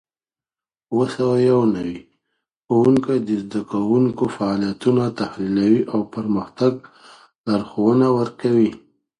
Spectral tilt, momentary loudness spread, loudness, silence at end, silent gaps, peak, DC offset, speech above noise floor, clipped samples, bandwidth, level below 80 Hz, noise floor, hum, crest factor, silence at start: -8 dB/octave; 9 LU; -20 LUFS; 0.45 s; 7.38-7.44 s; -4 dBFS; under 0.1%; over 71 dB; under 0.1%; 10.5 kHz; -56 dBFS; under -90 dBFS; none; 16 dB; 0.9 s